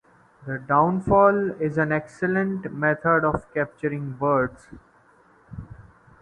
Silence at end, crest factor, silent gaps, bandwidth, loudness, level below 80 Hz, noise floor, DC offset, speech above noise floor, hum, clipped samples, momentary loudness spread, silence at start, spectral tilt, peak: 0.4 s; 20 dB; none; 9.6 kHz; -23 LUFS; -50 dBFS; -57 dBFS; under 0.1%; 34 dB; none; under 0.1%; 18 LU; 0.4 s; -9.5 dB/octave; -4 dBFS